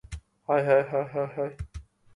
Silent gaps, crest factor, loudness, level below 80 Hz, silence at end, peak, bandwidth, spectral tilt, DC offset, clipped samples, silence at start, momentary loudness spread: none; 18 dB; -27 LUFS; -48 dBFS; 0.35 s; -10 dBFS; 11 kHz; -7.5 dB/octave; under 0.1%; under 0.1%; 0.1 s; 20 LU